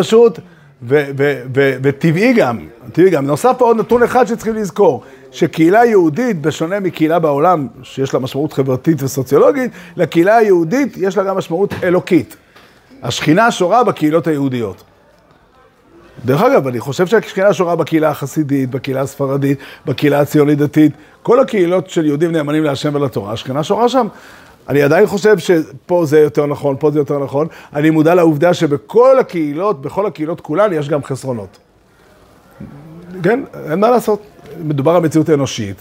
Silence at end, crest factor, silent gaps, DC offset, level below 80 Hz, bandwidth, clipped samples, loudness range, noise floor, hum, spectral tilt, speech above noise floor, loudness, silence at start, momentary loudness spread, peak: 0.05 s; 14 dB; none; under 0.1%; -54 dBFS; 16 kHz; under 0.1%; 4 LU; -48 dBFS; none; -6.5 dB/octave; 35 dB; -14 LUFS; 0 s; 10 LU; 0 dBFS